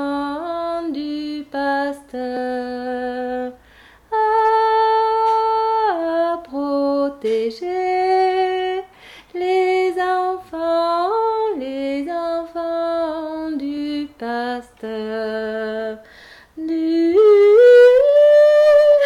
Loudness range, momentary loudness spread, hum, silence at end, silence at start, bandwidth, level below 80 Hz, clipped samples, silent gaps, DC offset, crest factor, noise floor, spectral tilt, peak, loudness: 11 LU; 15 LU; none; 0 s; 0 s; 12 kHz; -56 dBFS; under 0.1%; none; under 0.1%; 12 dB; -48 dBFS; -5 dB/octave; -4 dBFS; -18 LUFS